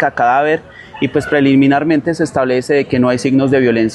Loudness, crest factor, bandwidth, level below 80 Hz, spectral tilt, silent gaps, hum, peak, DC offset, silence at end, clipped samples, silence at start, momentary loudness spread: -13 LUFS; 10 dB; 11.5 kHz; -48 dBFS; -6.5 dB/octave; none; none; -2 dBFS; under 0.1%; 0 s; under 0.1%; 0 s; 6 LU